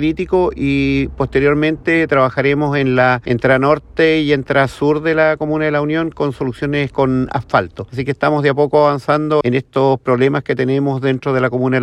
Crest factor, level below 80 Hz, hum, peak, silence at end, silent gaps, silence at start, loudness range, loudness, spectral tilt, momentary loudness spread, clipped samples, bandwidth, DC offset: 14 dB; -40 dBFS; none; 0 dBFS; 0 s; none; 0 s; 3 LU; -15 LUFS; -7.5 dB/octave; 5 LU; under 0.1%; 11 kHz; under 0.1%